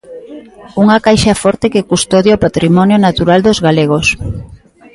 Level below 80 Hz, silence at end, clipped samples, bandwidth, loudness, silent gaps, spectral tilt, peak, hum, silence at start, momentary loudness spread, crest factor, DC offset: -34 dBFS; 0.4 s; under 0.1%; 11.5 kHz; -10 LUFS; none; -5.5 dB/octave; 0 dBFS; none; 0.1 s; 14 LU; 10 dB; under 0.1%